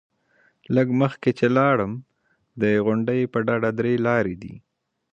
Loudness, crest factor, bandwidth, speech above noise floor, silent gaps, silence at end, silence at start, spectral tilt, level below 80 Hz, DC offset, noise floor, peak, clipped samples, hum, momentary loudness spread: -22 LUFS; 18 dB; 7.6 kHz; 42 dB; none; 0.55 s; 0.7 s; -8.5 dB/octave; -58 dBFS; under 0.1%; -63 dBFS; -4 dBFS; under 0.1%; none; 10 LU